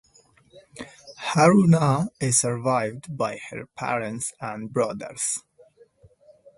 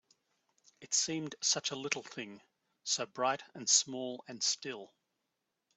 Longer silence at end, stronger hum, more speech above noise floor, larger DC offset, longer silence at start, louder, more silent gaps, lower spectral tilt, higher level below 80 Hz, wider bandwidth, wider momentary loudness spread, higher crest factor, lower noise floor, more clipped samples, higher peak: first, 1.15 s vs 0.9 s; neither; second, 35 dB vs 50 dB; neither; second, 0.55 s vs 0.8 s; first, -23 LUFS vs -33 LUFS; neither; first, -5 dB/octave vs -1 dB/octave; first, -62 dBFS vs -86 dBFS; first, 11.5 kHz vs 8.2 kHz; about the same, 18 LU vs 17 LU; about the same, 22 dB vs 26 dB; second, -58 dBFS vs -86 dBFS; neither; first, -4 dBFS vs -12 dBFS